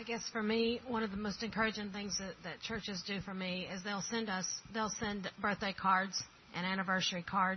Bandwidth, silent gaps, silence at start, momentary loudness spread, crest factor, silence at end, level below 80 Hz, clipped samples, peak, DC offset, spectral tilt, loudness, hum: 6.4 kHz; none; 0 s; 8 LU; 20 dB; 0 s; -64 dBFS; under 0.1%; -18 dBFS; under 0.1%; -3.5 dB/octave; -37 LUFS; none